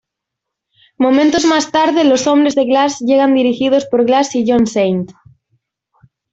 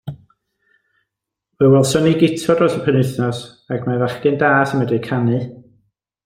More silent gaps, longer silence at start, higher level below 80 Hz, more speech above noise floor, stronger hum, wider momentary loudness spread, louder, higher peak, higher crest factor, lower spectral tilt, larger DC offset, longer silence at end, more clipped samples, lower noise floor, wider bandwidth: neither; first, 1 s vs 0.05 s; about the same, -54 dBFS vs -54 dBFS; about the same, 67 dB vs 64 dB; neither; second, 4 LU vs 11 LU; first, -13 LUFS vs -16 LUFS; about the same, -2 dBFS vs -2 dBFS; about the same, 12 dB vs 16 dB; second, -4.5 dB/octave vs -6.5 dB/octave; neither; first, 1.2 s vs 0.65 s; neither; about the same, -79 dBFS vs -80 dBFS; second, 8 kHz vs 16 kHz